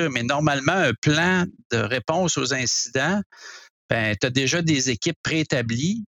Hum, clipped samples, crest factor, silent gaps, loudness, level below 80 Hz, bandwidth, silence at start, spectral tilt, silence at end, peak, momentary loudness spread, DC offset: none; under 0.1%; 18 dB; 0.98-1.02 s, 1.65-1.70 s, 3.26-3.30 s, 3.70-3.89 s, 5.16-5.24 s; -22 LUFS; -54 dBFS; 12.5 kHz; 0 s; -4 dB/octave; 0.1 s; -6 dBFS; 6 LU; under 0.1%